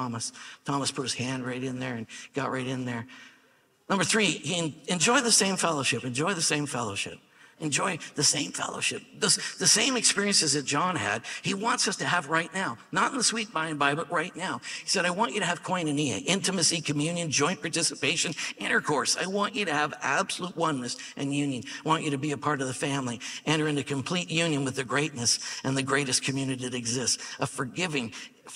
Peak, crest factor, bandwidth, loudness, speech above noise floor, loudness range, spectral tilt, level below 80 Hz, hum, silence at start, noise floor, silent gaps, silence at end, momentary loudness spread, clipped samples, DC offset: -8 dBFS; 22 dB; 15.5 kHz; -27 LUFS; 35 dB; 5 LU; -2.5 dB/octave; -70 dBFS; none; 0 s; -64 dBFS; none; 0 s; 10 LU; under 0.1%; under 0.1%